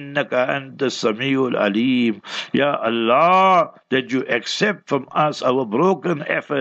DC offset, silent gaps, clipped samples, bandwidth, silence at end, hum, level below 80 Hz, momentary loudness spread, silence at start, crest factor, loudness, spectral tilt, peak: under 0.1%; none; under 0.1%; 8.2 kHz; 0 s; none; -72 dBFS; 8 LU; 0 s; 16 dB; -19 LUFS; -5 dB/octave; -2 dBFS